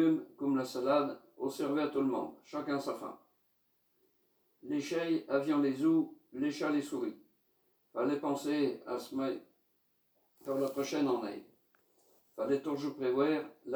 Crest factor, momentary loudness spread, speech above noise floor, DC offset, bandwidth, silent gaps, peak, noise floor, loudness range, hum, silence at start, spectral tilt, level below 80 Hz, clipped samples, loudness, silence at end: 18 dB; 11 LU; 43 dB; under 0.1%; over 20 kHz; none; -16 dBFS; -76 dBFS; 4 LU; none; 0 s; -6 dB/octave; -84 dBFS; under 0.1%; -35 LUFS; 0 s